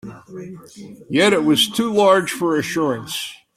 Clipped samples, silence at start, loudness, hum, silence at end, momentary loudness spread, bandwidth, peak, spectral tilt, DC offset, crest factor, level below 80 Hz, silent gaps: under 0.1%; 0.05 s; -17 LUFS; none; 0.2 s; 21 LU; 16 kHz; -2 dBFS; -4 dB/octave; under 0.1%; 16 dB; -60 dBFS; none